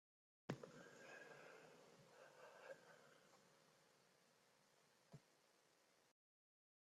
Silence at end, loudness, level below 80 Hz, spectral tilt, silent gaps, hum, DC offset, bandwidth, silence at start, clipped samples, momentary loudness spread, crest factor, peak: 0.7 s; -62 LUFS; under -90 dBFS; -5 dB/octave; none; none; under 0.1%; 13 kHz; 0.5 s; under 0.1%; 13 LU; 32 dB; -34 dBFS